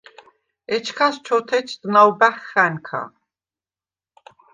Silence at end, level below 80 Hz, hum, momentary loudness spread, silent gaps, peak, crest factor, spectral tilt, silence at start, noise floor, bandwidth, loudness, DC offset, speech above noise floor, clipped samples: 1.45 s; -74 dBFS; none; 14 LU; none; -2 dBFS; 20 dB; -4.5 dB/octave; 0.7 s; under -90 dBFS; 9.6 kHz; -19 LUFS; under 0.1%; over 71 dB; under 0.1%